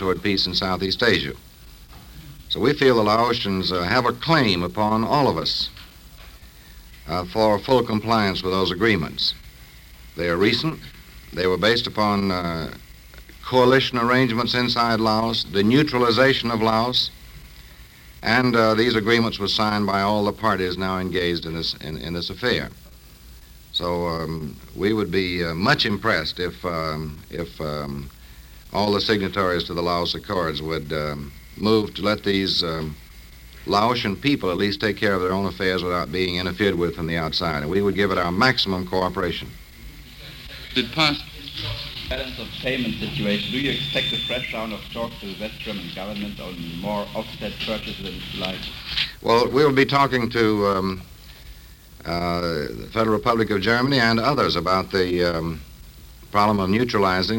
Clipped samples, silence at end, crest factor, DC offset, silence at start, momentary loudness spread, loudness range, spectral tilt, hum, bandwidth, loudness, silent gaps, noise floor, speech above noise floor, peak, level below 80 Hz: under 0.1%; 0 s; 18 dB; under 0.1%; 0 s; 13 LU; 6 LU; -5.5 dB/octave; none; 17 kHz; -22 LUFS; none; -45 dBFS; 23 dB; -4 dBFS; -44 dBFS